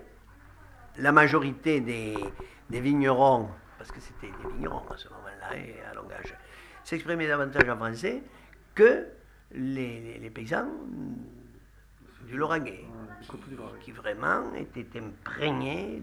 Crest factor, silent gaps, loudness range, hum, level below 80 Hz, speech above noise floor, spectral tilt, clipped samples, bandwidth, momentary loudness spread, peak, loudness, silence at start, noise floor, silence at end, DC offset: 26 dB; none; 12 LU; none; -52 dBFS; 26 dB; -6.5 dB/octave; under 0.1%; 14 kHz; 23 LU; -4 dBFS; -27 LUFS; 0 s; -55 dBFS; 0 s; under 0.1%